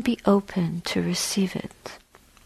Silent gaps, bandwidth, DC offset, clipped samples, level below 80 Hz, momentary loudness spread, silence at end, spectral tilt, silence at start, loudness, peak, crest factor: none; 14 kHz; under 0.1%; under 0.1%; -54 dBFS; 18 LU; 0.5 s; -5 dB/octave; 0 s; -25 LUFS; -6 dBFS; 20 dB